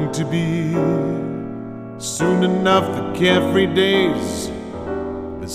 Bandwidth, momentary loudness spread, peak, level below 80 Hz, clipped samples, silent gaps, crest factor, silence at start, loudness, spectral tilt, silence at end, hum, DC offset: 15.5 kHz; 13 LU; -2 dBFS; -44 dBFS; under 0.1%; none; 16 dB; 0 s; -19 LUFS; -5.5 dB/octave; 0 s; none; under 0.1%